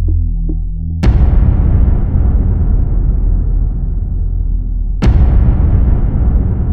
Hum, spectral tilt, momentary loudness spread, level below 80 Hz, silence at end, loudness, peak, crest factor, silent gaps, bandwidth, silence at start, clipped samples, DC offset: none; -9.5 dB/octave; 8 LU; -12 dBFS; 0 s; -14 LUFS; 0 dBFS; 10 dB; none; 4.6 kHz; 0 s; under 0.1%; under 0.1%